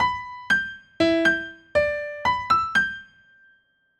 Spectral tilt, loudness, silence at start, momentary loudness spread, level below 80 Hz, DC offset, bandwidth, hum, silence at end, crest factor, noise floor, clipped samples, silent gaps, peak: -4.5 dB/octave; -23 LUFS; 0 s; 9 LU; -52 dBFS; under 0.1%; 12.5 kHz; none; 0.95 s; 16 dB; -63 dBFS; under 0.1%; none; -8 dBFS